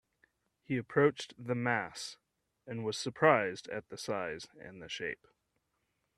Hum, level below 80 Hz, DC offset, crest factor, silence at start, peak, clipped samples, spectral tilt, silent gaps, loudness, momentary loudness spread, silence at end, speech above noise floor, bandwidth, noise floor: none; -74 dBFS; under 0.1%; 26 dB; 0.7 s; -10 dBFS; under 0.1%; -5 dB/octave; none; -34 LUFS; 17 LU; 1.05 s; 47 dB; 12.5 kHz; -81 dBFS